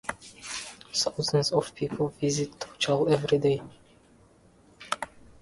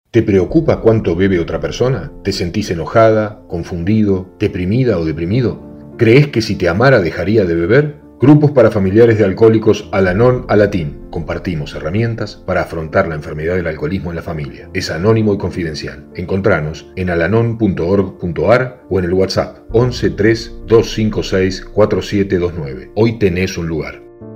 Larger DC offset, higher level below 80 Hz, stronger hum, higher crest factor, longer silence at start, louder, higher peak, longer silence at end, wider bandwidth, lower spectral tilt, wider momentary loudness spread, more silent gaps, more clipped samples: neither; second, -60 dBFS vs -34 dBFS; neither; first, 20 dB vs 14 dB; about the same, 0.05 s vs 0.15 s; second, -28 LUFS vs -14 LUFS; second, -10 dBFS vs 0 dBFS; first, 0.35 s vs 0 s; second, 11.5 kHz vs 15.5 kHz; second, -4.5 dB/octave vs -7 dB/octave; about the same, 13 LU vs 12 LU; neither; second, under 0.1% vs 0.1%